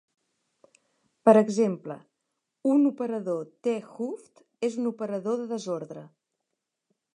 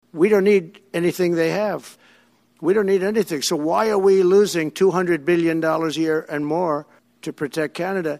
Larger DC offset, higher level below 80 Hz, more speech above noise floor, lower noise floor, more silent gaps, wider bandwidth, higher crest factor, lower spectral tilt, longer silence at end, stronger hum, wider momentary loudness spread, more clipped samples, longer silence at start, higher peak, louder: neither; second, -82 dBFS vs -64 dBFS; first, 57 dB vs 38 dB; first, -83 dBFS vs -57 dBFS; neither; second, 10.5 kHz vs 15.5 kHz; first, 24 dB vs 14 dB; first, -7 dB/octave vs -5.5 dB/octave; first, 1.1 s vs 0 s; neither; first, 19 LU vs 10 LU; neither; first, 1.25 s vs 0.15 s; about the same, -4 dBFS vs -4 dBFS; second, -27 LUFS vs -20 LUFS